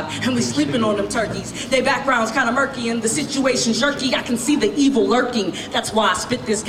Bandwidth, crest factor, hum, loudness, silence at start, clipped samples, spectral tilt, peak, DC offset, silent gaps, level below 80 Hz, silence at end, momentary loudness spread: 15 kHz; 14 dB; none; -19 LUFS; 0 s; under 0.1%; -3.5 dB/octave; -6 dBFS; under 0.1%; none; -48 dBFS; 0 s; 5 LU